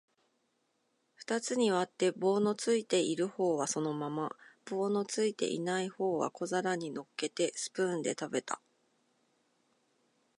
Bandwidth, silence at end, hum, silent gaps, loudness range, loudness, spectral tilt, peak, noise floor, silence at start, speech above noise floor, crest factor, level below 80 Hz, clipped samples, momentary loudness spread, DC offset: 11.5 kHz; 1.8 s; none; none; 5 LU; -33 LUFS; -4 dB/octave; -16 dBFS; -78 dBFS; 1.2 s; 45 dB; 18 dB; -84 dBFS; under 0.1%; 8 LU; under 0.1%